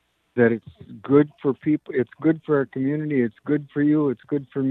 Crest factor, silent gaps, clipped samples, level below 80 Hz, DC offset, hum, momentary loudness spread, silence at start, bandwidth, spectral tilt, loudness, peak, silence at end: 18 dB; none; under 0.1%; -66 dBFS; under 0.1%; none; 8 LU; 0.35 s; 4 kHz; -11 dB/octave; -23 LUFS; -4 dBFS; 0 s